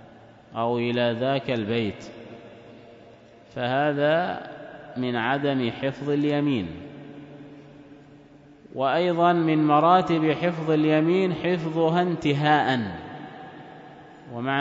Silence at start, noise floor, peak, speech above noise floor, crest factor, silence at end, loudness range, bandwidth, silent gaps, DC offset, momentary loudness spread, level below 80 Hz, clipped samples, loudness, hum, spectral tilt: 0.5 s; -50 dBFS; -6 dBFS; 27 dB; 18 dB; 0 s; 7 LU; 7.8 kHz; none; under 0.1%; 22 LU; -62 dBFS; under 0.1%; -23 LUFS; none; -7.5 dB/octave